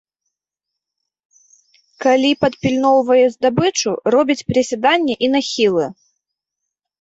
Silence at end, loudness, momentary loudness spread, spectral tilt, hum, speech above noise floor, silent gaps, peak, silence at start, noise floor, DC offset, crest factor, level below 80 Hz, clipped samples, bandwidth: 1.1 s; -16 LUFS; 5 LU; -4.5 dB/octave; none; 67 dB; none; -2 dBFS; 2 s; -82 dBFS; under 0.1%; 16 dB; -54 dBFS; under 0.1%; 8 kHz